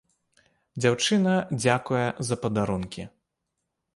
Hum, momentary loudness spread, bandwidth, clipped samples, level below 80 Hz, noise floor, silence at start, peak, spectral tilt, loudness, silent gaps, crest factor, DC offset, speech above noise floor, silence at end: none; 16 LU; 11.5 kHz; under 0.1%; -56 dBFS; -81 dBFS; 0.75 s; -8 dBFS; -5 dB/octave; -25 LUFS; none; 20 dB; under 0.1%; 56 dB; 0.9 s